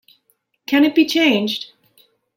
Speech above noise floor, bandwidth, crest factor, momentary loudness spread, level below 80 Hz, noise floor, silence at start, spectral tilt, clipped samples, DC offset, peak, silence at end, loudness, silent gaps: 50 dB; 16.5 kHz; 16 dB; 19 LU; -68 dBFS; -65 dBFS; 0.7 s; -4 dB/octave; under 0.1%; under 0.1%; -4 dBFS; 0.7 s; -16 LUFS; none